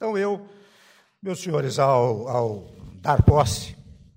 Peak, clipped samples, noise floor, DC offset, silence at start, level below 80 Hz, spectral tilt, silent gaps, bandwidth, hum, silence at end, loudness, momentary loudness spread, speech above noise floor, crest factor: -6 dBFS; under 0.1%; -56 dBFS; under 0.1%; 0 s; -36 dBFS; -6 dB/octave; none; 16 kHz; none; 0.4 s; -23 LUFS; 15 LU; 35 dB; 18 dB